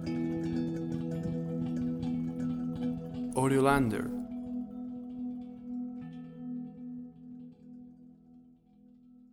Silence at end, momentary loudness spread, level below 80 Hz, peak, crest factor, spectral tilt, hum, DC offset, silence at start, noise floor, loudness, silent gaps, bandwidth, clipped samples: 0.05 s; 20 LU; -56 dBFS; -12 dBFS; 22 dB; -7 dB/octave; none; under 0.1%; 0 s; -60 dBFS; -34 LUFS; none; 13.5 kHz; under 0.1%